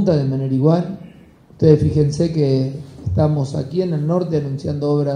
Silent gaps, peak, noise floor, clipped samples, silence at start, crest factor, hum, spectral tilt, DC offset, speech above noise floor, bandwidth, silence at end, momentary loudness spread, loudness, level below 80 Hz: none; 0 dBFS; -45 dBFS; under 0.1%; 0 s; 16 dB; none; -9 dB/octave; under 0.1%; 28 dB; 9.6 kHz; 0 s; 9 LU; -18 LUFS; -44 dBFS